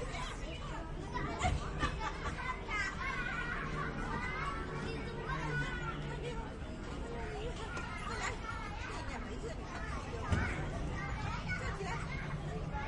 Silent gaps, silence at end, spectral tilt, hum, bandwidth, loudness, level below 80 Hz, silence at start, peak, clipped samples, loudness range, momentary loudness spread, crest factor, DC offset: none; 0 s; -5 dB/octave; none; 11 kHz; -40 LUFS; -44 dBFS; 0 s; -18 dBFS; under 0.1%; 4 LU; 7 LU; 20 dB; under 0.1%